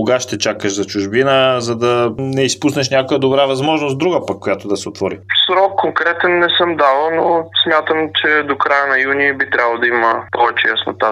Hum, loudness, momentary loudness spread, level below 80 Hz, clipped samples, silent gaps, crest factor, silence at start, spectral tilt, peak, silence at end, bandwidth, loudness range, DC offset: none; -14 LUFS; 6 LU; -58 dBFS; under 0.1%; none; 14 dB; 0 s; -4 dB/octave; 0 dBFS; 0 s; 14.5 kHz; 2 LU; under 0.1%